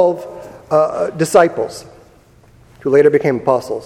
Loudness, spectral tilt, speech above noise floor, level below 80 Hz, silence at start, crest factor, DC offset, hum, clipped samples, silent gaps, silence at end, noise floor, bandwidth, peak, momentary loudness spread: -15 LUFS; -6 dB/octave; 33 dB; -52 dBFS; 0 s; 16 dB; under 0.1%; none; under 0.1%; none; 0 s; -47 dBFS; 14 kHz; 0 dBFS; 17 LU